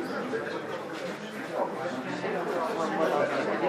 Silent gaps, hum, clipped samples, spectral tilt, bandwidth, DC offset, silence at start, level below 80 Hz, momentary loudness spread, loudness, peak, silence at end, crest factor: none; none; under 0.1%; -5 dB/octave; 15.5 kHz; under 0.1%; 0 s; -80 dBFS; 9 LU; -31 LUFS; -14 dBFS; 0 s; 16 dB